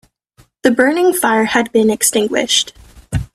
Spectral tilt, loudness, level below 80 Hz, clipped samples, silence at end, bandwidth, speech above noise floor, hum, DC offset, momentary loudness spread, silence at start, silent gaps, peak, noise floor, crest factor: -3 dB/octave; -14 LUFS; -38 dBFS; under 0.1%; 0.1 s; 15.5 kHz; 39 dB; none; under 0.1%; 9 LU; 0.65 s; none; 0 dBFS; -52 dBFS; 16 dB